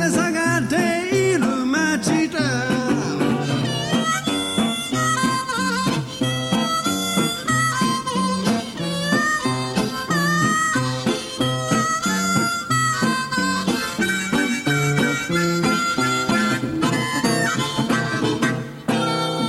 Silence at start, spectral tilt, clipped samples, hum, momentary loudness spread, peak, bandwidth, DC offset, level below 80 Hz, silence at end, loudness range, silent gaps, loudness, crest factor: 0 s; -4 dB/octave; under 0.1%; none; 3 LU; -6 dBFS; 16 kHz; under 0.1%; -52 dBFS; 0 s; 1 LU; none; -20 LUFS; 14 dB